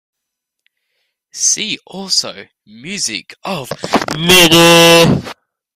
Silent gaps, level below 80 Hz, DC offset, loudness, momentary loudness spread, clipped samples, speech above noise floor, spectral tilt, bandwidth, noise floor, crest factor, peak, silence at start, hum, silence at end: none; -44 dBFS; under 0.1%; -10 LUFS; 18 LU; under 0.1%; 65 dB; -3 dB/octave; 16.5 kHz; -77 dBFS; 14 dB; 0 dBFS; 1.35 s; none; 0.45 s